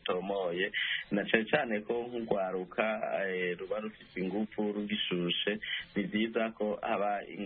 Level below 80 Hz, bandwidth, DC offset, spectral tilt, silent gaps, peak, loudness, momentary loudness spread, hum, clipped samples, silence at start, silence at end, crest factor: -68 dBFS; 4.6 kHz; under 0.1%; -2.5 dB/octave; none; -12 dBFS; -33 LUFS; 5 LU; none; under 0.1%; 0.05 s; 0 s; 22 dB